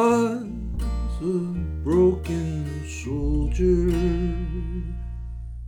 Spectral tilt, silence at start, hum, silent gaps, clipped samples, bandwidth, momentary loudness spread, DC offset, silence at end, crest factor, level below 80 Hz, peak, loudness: -8 dB/octave; 0 s; none; none; under 0.1%; 12 kHz; 12 LU; under 0.1%; 0 s; 16 dB; -30 dBFS; -8 dBFS; -25 LUFS